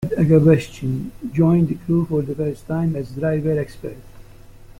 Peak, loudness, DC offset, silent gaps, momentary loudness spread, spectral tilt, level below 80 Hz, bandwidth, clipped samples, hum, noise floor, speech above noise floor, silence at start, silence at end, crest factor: -2 dBFS; -20 LUFS; under 0.1%; none; 12 LU; -9 dB/octave; -44 dBFS; 11.5 kHz; under 0.1%; none; -42 dBFS; 23 dB; 0 s; 0.15 s; 18 dB